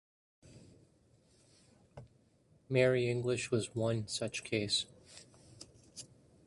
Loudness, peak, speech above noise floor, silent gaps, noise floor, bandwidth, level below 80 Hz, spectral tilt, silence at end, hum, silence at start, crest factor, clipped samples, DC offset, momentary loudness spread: -34 LUFS; -16 dBFS; 35 dB; none; -68 dBFS; 11.5 kHz; -68 dBFS; -4.5 dB/octave; 0.4 s; none; 0.45 s; 22 dB; under 0.1%; under 0.1%; 25 LU